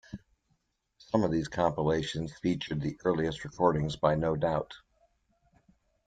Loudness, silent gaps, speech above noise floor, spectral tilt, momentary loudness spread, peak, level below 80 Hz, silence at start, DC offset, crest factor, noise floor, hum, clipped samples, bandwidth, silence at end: -30 LUFS; none; 46 dB; -6.5 dB/octave; 8 LU; -10 dBFS; -54 dBFS; 0.1 s; under 0.1%; 22 dB; -76 dBFS; none; under 0.1%; 9.2 kHz; 1.3 s